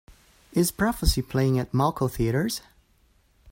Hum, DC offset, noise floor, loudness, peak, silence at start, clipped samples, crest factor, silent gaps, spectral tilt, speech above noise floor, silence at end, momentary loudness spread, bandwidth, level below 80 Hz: none; under 0.1%; -63 dBFS; -25 LUFS; -8 dBFS; 0.55 s; under 0.1%; 18 dB; none; -5.5 dB/octave; 39 dB; 0 s; 5 LU; 16.5 kHz; -36 dBFS